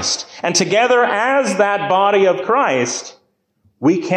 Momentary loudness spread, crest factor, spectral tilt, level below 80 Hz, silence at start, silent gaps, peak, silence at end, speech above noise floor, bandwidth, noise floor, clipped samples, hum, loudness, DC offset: 7 LU; 12 dB; -3.5 dB/octave; -60 dBFS; 0 s; none; -4 dBFS; 0 s; 46 dB; 14 kHz; -61 dBFS; under 0.1%; none; -15 LUFS; under 0.1%